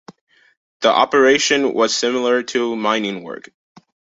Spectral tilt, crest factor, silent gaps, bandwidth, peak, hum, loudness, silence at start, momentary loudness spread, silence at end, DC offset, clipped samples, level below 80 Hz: -2.5 dB/octave; 18 dB; none; 8 kHz; -2 dBFS; none; -16 LUFS; 0.8 s; 13 LU; 0.75 s; under 0.1%; under 0.1%; -64 dBFS